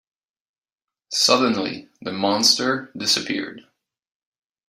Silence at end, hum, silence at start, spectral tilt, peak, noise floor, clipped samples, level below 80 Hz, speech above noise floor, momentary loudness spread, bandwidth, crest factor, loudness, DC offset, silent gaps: 1.1 s; none; 1.1 s; -2 dB/octave; -2 dBFS; -90 dBFS; under 0.1%; -68 dBFS; 68 dB; 14 LU; 16 kHz; 22 dB; -19 LUFS; under 0.1%; none